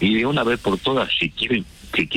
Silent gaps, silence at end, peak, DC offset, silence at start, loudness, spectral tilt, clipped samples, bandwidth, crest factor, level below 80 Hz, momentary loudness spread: none; 0 s; -8 dBFS; under 0.1%; 0 s; -21 LUFS; -5.5 dB/octave; under 0.1%; 15.5 kHz; 12 dB; -46 dBFS; 5 LU